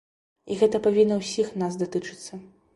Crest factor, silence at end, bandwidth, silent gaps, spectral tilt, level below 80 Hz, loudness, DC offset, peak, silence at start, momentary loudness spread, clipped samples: 18 dB; 0.3 s; 11.5 kHz; none; -5.5 dB/octave; -64 dBFS; -24 LUFS; under 0.1%; -8 dBFS; 0.45 s; 19 LU; under 0.1%